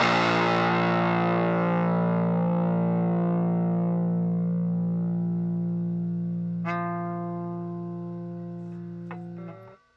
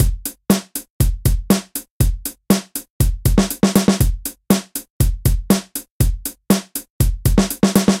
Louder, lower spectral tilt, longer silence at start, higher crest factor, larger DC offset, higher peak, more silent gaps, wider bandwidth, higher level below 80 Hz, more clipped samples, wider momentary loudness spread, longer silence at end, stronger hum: second, -26 LUFS vs -19 LUFS; first, -8 dB/octave vs -5.5 dB/octave; about the same, 0 s vs 0 s; about the same, 16 dB vs 18 dB; neither; second, -10 dBFS vs 0 dBFS; second, none vs 0.90-1.00 s, 1.90-2.00 s, 2.90-3.00 s, 4.90-5.00 s, 5.90-6.00 s, 6.90-7.00 s; second, 7.2 kHz vs 17 kHz; second, -70 dBFS vs -22 dBFS; neither; about the same, 14 LU vs 13 LU; first, 0.2 s vs 0 s; neither